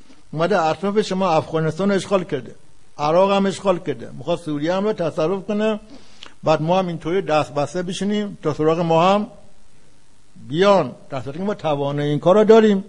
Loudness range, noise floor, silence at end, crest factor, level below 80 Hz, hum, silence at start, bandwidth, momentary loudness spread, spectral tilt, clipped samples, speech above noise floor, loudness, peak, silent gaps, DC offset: 2 LU; -54 dBFS; 0 s; 18 dB; -54 dBFS; none; 0.35 s; 11 kHz; 10 LU; -6.5 dB/octave; under 0.1%; 35 dB; -20 LUFS; 0 dBFS; none; 1%